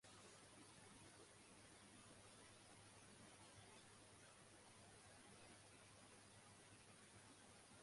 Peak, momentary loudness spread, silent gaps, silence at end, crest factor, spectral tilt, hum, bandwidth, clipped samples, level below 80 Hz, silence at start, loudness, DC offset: -52 dBFS; 1 LU; none; 0 s; 14 dB; -3 dB/octave; none; 11.5 kHz; under 0.1%; -84 dBFS; 0 s; -65 LUFS; under 0.1%